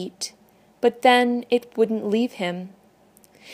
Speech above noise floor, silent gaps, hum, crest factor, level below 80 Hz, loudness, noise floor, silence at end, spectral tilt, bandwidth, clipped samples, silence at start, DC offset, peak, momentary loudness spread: 34 dB; none; none; 20 dB; -74 dBFS; -22 LUFS; -56 dBFS; 0 s; -4 dB/octave; 15.5 kHz; under 0.1%; 0 s; under 0.1%; -2 dBFS; 16 LU